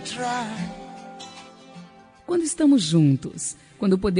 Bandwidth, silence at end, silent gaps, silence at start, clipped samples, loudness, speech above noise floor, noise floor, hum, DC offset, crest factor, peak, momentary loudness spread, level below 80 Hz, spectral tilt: 10 kHz; 0 s; none; 0 s; under 0.1%; -23 LUFS; 25 dB; -47 dBFS; none; under 0.1%; 16 dB; -8 dBFS; 24 LU; -50 dBFS; -5.5 dB/octave